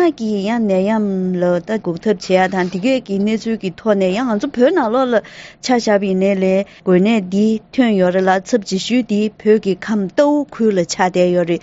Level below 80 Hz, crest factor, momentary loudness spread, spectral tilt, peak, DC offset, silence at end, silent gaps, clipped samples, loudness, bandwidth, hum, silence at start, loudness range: -54 dBFS; 16 dB; 5 LU; -5.5 dB/octave; 0 dBFS; under 0.1%; 0.05 s; none; under 0.1%; -16 LUFS; 8 kHz; none; 0 s; 2 LU